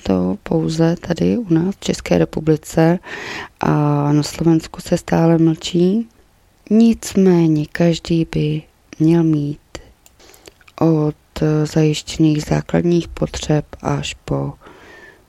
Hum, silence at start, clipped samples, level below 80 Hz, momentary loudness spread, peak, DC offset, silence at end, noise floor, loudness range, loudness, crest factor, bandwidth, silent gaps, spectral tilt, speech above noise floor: none; 0.05 s; under 0.1%; -42 dBFS; 9 LU; 0 dBFS; under 0.1%; 0.25 s; -53 dBFS; 3 LU; -17 LUFS; 16 dB; 13 kHz; none; -7 dB/octave; 36 dB